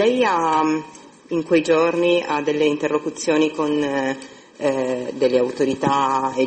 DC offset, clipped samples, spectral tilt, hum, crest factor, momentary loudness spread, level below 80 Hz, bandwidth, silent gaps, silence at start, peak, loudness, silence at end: under 0.1%; under 0.1%; -5 dB/octave; none; 14 dB; 8 LU; -60 dBFS; 8.8 kHz; none; 0 s; -6 dBFS; -20 LUFS; 0 s